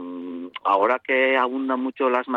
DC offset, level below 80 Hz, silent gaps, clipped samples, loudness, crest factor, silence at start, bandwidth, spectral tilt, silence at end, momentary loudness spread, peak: under 0.1%; -72 dBFS; none; under 0.1%; -21 LUFS; 16 dB; 0 s; 6.2 kHz; -5.5 dB/octave; 0 s; 14 LU; -8 dBFS